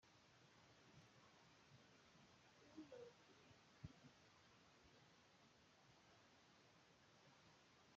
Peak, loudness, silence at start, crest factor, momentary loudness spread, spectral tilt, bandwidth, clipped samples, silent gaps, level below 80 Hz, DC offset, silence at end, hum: -44 dBFS; -65 LUFS; 0 s; 26 dB; 8 LU; -4 dB/octave; 7.4 kHz; under 0.1%; none; -88 dBFS; under 0.1%; 0 s; none